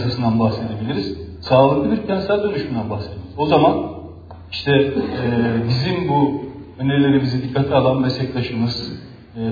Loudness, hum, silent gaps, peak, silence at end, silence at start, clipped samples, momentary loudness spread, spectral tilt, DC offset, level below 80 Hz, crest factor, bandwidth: -19 LUFS; none; none; -2 dBFS; 0 s; 0 s; under 0.1%; 15 LU; -8.5 dB/octave; under 0.1%; -44 dBFS; 16 dB; 5 kHz